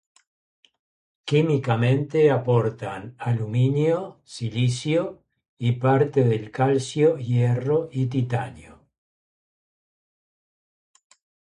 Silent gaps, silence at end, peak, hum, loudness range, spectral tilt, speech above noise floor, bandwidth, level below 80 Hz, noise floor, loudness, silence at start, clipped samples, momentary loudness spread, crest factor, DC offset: 5.49-5.57 s; 2.9 s; -6 dBFS; none; 7 LU; -7.5 dB/octave; over 68 dB; 10.5 kHz; -60 dBFS; under -90 dBFS; -23 LUFS; 1.25 s; under 0.1%; 11 LU; 18 dB; under 0.1%